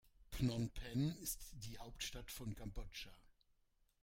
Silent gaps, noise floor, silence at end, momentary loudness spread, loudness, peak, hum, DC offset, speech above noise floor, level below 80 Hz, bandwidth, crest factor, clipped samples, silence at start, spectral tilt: none; -78 dBFS; 0.75 s; 12 LU; -46 LUFS; -28 dBFS; none; under 0.1%; 33 dB; -56 dBFS; 16.5 kHz; 20 dB; under 0.1%; 0.05 s; -5 dB/octave